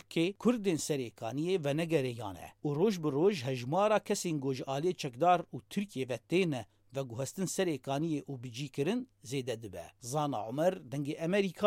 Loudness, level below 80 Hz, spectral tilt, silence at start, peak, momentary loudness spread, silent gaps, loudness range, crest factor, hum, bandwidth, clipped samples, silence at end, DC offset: -34 LUFS; -72 dBFS; -5.5 dB/octave; 0.1 s; -14 dBFS; 11 LU; none; 5 LU; 20 dB; none; 16.5 kHz; under 0.1%; 0 s; under 0.1%